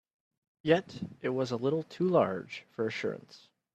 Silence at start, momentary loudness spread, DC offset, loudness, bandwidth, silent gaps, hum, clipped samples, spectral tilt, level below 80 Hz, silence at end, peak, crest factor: 0.65 s; 12 LU; under 0.1%; -31 LUFS; 8.8 kHz; none; none; under 0.1%; -6.5 dB/octave; -72 dBFS; 0.4 s; -12 dBFS; 22 dB